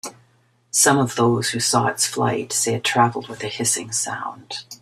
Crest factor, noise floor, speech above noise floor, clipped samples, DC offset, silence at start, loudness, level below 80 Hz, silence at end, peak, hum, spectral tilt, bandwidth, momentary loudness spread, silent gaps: 20 dB; -60 dBFS; 39 dB; under 0.1%; under 0.1%; 0.05 s; -20 LUFS; -60 dBFS; 0.05 s; -2 dBFS; none; -3 dB/octave; 15.5 kHz; 14 LU; none